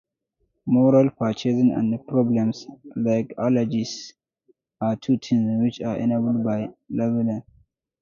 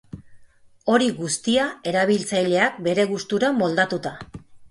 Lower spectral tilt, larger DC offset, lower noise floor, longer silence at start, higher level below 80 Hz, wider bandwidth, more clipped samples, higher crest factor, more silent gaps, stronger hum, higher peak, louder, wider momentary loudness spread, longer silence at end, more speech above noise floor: first, -7.5 dB/octave vs -4 dB/octave; neither; first, -73 dBFS vs -50 dBFS; first, 0.65 s vs 0.15 s; about the same, -60 dBFS vs -58 dBFS; second, 7.2 kHz vs 11.5 kHz; neither; about the same, 16 dB vs 18 dB; neither; neither; about the same, -6 dBFS vs -4 dBFS; about the same, -23 LUFS vs -21 LUFS; about the same, 11 LU vs 9 LU; first, 0.6 s vs 0.05 s; first, 52 dB vs 29 dB